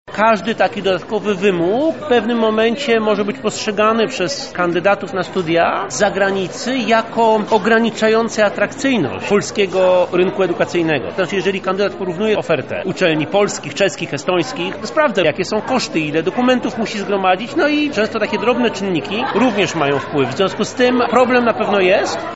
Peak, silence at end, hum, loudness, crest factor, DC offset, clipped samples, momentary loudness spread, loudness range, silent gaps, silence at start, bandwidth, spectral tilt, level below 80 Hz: 0 dBFS; 0 s; none; -16 LUFS; 16 dB; 0.5%; under 0.1%; 6 LU; 2 LU; none; 0.05 s; 8 kHz; -3.5 dB/octave; -54 dBFS